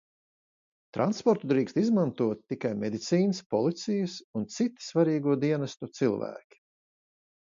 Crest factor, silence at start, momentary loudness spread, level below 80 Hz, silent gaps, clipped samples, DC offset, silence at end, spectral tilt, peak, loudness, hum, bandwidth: 18 dB; 0.95 s; 9 LU; -72 dBFS; 3.46-3.50 s, 4.24-4.34 s; under 0.1%; under 0.1%; 1.2 s; -6.5 dB/octave; -10 dBFS; -29 LUFS; none; 7.6 kHz